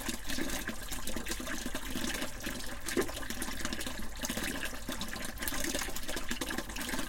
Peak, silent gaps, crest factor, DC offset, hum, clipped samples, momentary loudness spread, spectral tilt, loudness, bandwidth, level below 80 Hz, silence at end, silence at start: -14 dBFS; none; 22 dB; under 0.1%; none; under 0.1%; 5 LU; -2.5 dB/octave; -37 LUFS; 17 kHz; -46 dBFS; 0 s; 0 s